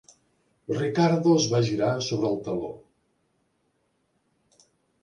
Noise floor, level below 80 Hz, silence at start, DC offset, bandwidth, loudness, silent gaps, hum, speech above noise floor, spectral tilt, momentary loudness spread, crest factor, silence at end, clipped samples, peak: -72 dBFS; -64 dBFS; 0.7 s; under 0.1%; 10.5 kHz; -25 LUFS; none; none; 48 dB; -5.5 dB/octave; 15 LU; 18 dB; 2.25 s; under 0.1%; -10 dBFS